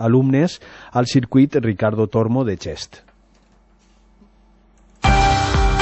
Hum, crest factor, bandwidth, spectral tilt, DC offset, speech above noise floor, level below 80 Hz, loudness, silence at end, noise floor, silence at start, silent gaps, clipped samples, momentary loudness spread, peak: none; 16 dB; 8.4 kHz; -6.5 dB/octave; under 0.1%; 36 dB; -28 dBFS; -18 LUFS; 0 s; -54 dBFS; 0 s; none; under 0.1%; 13 LU; -2 dBFS